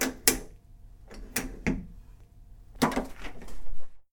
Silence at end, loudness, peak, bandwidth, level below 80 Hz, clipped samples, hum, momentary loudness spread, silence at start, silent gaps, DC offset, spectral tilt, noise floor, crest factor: 0.1 s; -30 LUFS; -2 dBFS; 19 kHz; -44 dBFS; under 0.1%; none; 25 LU; 0 s; none; under 0.1%; -3 dB/octave; -51 dBFS; 28 dB